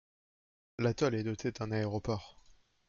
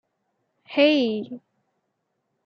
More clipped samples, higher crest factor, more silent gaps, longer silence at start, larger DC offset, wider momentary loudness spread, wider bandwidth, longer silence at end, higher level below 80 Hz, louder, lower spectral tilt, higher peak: neither; about the same, 18 dB vs 20 dB; neither; about the same, 0.8 s vs 0.7 s; neither; second, 8 LU vs 20 LU; first, 7.2 kHz vs 6.4 kHz; second, 0.55 s vs 1.1 s; first, -60 dBFS vs -80 dBFS; second, -35 LUFS vs -22 LUFS; about the same, -6.5 dB/octave vs -5.5 dB/octave; second, -18 dBFS vs -6 dBFS